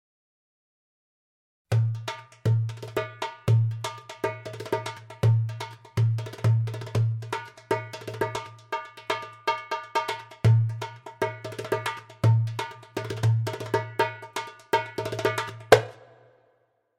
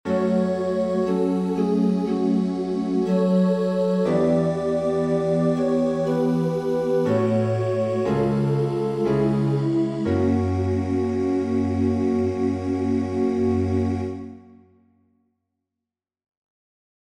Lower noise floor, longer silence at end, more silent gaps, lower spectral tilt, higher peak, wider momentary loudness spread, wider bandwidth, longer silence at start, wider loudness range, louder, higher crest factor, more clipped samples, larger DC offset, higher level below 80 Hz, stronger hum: second, -69 dBFS vs -87 dBFS; second, 0.95 s vs 2.6 s; neither; second, -6 dB/octave vs -8.5 dB/octave; first, 0 dBFS vs -10 dBFS; first, 12 LU vs 3 LU; first, 15 kHz vs 11 kHz; first, 1.7 s vs 0.05 s; about the same, 4 LU vs 5 LU; second, -28 LUFS vs -22 LUFS; first, 28 dB vs 12 dB; neither; neither; second, -58 dBFS vs -52 dBFS; neither